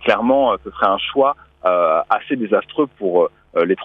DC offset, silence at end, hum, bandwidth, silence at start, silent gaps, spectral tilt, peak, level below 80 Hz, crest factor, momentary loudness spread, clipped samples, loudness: under 0.1%; 0 s; none; 5.8 kHz; 0 s; none; -7 dB/octave; -2 dBFS; -52 dBFS; 16 dB; 5 LU; under 0.1%; -18 LUFS